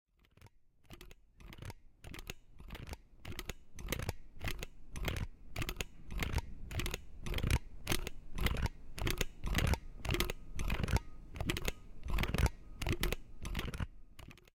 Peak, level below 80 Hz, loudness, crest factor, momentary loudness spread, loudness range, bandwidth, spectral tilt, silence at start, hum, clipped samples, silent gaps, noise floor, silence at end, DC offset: -14 dBFS; -42 dBFS; -40 LUFS; 26 dB; 16 LU; 9 LU; 17 kHz; -4.5 dB/octave; 0.45 s; none; under 0.1%; none; -63 dBFS; 0.2 s; under 0.1%